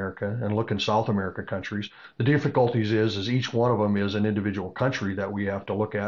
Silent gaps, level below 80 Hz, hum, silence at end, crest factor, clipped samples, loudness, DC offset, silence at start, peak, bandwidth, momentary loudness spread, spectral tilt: none; -60 dBFS; none; 0 s; 16 dB; under 0.1%; -26 LUFS; 0.1%; 0 s; -10 dBFS; 7.4 kHz; 8 LU; -7 dB/octave